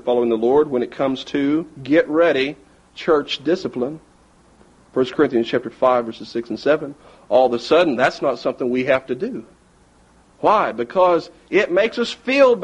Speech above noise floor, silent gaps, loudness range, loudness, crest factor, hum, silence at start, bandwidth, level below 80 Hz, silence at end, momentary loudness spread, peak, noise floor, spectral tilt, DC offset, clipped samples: 35 dB; none; 3 LU; -19 LUFS; 16 dB; none; 0.05 s; 9.6 kHz; -56 dBFS; 0 s; 10 LU; -2 dBFS; -53 dBFS; -5.5 dB/octave; under 0.1%; under 0.1%